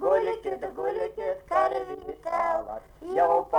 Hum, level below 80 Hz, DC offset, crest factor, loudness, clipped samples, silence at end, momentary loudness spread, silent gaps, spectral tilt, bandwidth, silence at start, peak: none; -56 dBFS; under 0.1%; 16 dB; -28 LUFS; under 0.1%; 0 s; 12 LU; none; -5.5 dB/octave; 19 kHz; 0 s; -12 dBFS